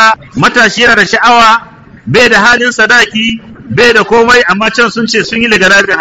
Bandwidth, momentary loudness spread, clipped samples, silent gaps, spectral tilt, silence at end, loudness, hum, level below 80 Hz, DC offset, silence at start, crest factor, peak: 17 kHz; 7 LU; 2%; none; -3 dB/octave; 0 s; -6 LUFS; none; -38 dBFS; 1%; 0 s; 8 dB; 0 dBFS